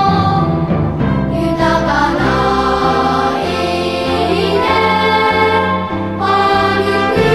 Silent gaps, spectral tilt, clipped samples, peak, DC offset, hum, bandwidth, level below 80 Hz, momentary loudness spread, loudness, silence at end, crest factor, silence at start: none; -6 dB/octave; under 0.1%; 0 dBFS; 0.6%; none; 14 kHz; -32 dBFS; 4 LU; -13 LUFS; 0 s; 12 dB; 0 s